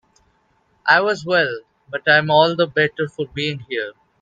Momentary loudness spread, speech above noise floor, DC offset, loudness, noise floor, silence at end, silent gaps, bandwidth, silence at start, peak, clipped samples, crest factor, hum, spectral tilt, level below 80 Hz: 12 LU; 44 dB; under 0.1%; -18 LUFS; -62 dBFS; 0.3 s; none; 9 kHz; 0.85 s; 0 dBFS; under 0.1%; 20 dB; none; -5.5 dB/octave; -60 dBFS